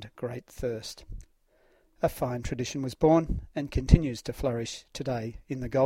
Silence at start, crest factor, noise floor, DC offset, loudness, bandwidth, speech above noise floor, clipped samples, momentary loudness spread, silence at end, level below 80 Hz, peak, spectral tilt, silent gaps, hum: 0 s; 26 dB; -65 dBFS; under 0.1%; -29 LUFS; 16 kHz; 37 dB; under 0.1%; 14 LU; 0 s; -36 dBFS; -4 dBFS; -6.5 dB/octave; none; none